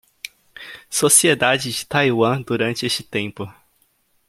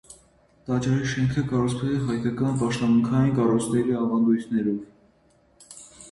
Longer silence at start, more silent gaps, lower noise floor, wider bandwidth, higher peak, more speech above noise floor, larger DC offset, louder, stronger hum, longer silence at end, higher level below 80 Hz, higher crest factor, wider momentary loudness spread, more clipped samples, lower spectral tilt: first, 0.25 s vs 0.1 s; neither; about the same, -63 dBFS vs -61 dBFS; first, 16.5 kHz vs 11.5 kHz; first, 0 dBFS vs -10 dBFS; first, 44 dB vs 38 dB; neither; first, -18 LUFS vs -24 LUFS; neither; first, 0.8 s vs 0 s; second, -60 dBFS vs -52 dBFS; first, 20 dB vs 14 dB; first, 24 LU vs 9 LU; neither; second, -3 dB/octave vs -7 dB/octave